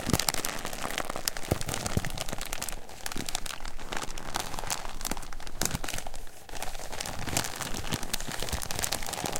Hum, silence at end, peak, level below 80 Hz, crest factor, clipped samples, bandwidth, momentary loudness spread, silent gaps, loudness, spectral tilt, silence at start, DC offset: none; 0 s; -2 dBFS; -40 dBFS; 30 dB; under 0.1%; 17 kHz; 8 LU; none; -33 LUFS; -2.5 dB/octave; 0 s; under 0.1%